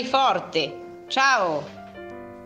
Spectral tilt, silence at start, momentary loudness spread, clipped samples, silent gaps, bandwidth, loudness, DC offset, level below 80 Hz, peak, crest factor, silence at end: -2.5 dB/octave; 0 s; 20 LU; under 0.1%; none; 9.6 kHz; -22 LUFS; under 0.1%; -64 dBFS; -6 dBFS; 18 dB; 0 s